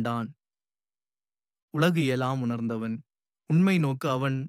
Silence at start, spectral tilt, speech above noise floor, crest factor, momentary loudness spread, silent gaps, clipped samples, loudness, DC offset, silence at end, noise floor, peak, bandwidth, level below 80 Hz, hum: 0 s; -7 dB/octave; over 64 dB; 18 dB; 12 LU; 1.62-1.68 s; under 0.1%; -27 LUFS; under 0.1%; 0 s; under -90 dBFS; -10 dBFS; 15 kHz; -72 dBFS; none